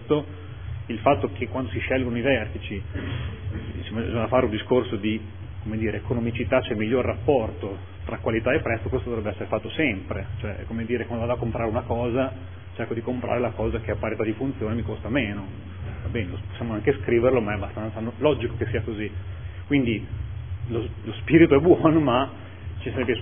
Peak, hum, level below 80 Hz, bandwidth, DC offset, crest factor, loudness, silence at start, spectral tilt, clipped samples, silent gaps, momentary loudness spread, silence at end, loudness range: -2 dBFS; none; -42 dBFS; 3.6 kHz; 0.5%; 22 dB; -25 LUFS; 0 s; -11 dB/octave; under 0.1%; none; 13 LU; 0 s; 6 LU